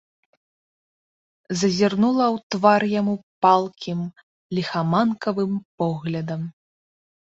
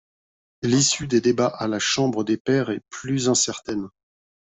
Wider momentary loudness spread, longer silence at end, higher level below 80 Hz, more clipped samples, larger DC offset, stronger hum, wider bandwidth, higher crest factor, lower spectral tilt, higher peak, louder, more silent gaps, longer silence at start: about the same, 12 LU vs 11 LU; first, 0.85 s vs 0.7 s; second, -64 dBFS vs -58 dBFS; neither; neither; neither; about the same, 8 kHz vs 8.4 kHz; about the same, 20 dB vs 16 dB; first, -6 dB/octave vs -4 dB/octave; about the same, -4 dBFS vs -6 dBFS; about the same, -22 LUFS vs -22 LUFS; first, 2.43-2.50 s, 3.23-3.42 s, 4.23-4.50 s, 5.65-5.78 s vs 2.40-2.45 s; first, 1.5 s vs 0.6 s